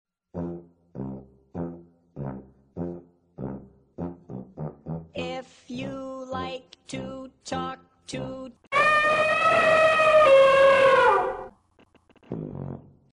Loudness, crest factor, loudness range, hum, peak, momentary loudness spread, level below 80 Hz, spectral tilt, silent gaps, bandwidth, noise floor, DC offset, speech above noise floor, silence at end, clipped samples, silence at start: -20 LUFS; 16 dB; 20 LU; none; -8 dBFS; 24 LU; -56 dBFS; -5 dB/octave; none; 11.5 kHz; -61 dBFS; under 0.1%; 27 dB; 0.3 s; under 0.1%; 0.35 s